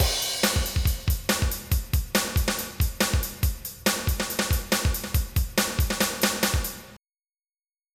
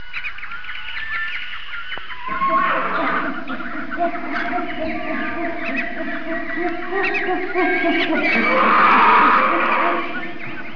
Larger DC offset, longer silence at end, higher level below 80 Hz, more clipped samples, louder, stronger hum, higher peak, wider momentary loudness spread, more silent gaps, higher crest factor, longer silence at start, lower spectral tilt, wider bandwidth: second, under 0.1% vs 5%; first, 0.95 s vs 0 s; first, -30 dBFS vs -48 dBFS; neither; second, -25 LUFS vs -19 LUFS; neither; second, -10 dBFS vs -4 dBFS; second, 5 LU vs 16 LU; neither; about the same, 16 dB vs 16 dB; about the same, 0 s vs 0 s; second, -3.5 dB/octave vs -5.5 dB/octave; first, 19 kHz vs 5.4 kHz